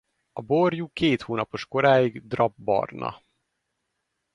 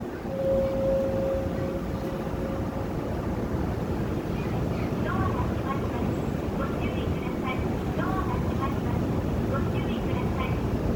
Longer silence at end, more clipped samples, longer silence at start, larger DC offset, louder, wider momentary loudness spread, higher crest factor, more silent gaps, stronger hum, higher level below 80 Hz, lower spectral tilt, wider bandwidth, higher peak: first, 1.2 s vs 0 s; neither; first, 0.35 s vs 0 s; neither; first, -24 LUFS vs -28 LUFS; first, 14 LU vs 5 LU; first, 20 dB vs 14 dB; neither; neither; second, -60 dBFS vs -38 dBFS; about the same, -7 dB/octave vs -8 dB/octave; second, 11 kHz vs over 20 kHz; first, -6 dBFS vs -14 dBFS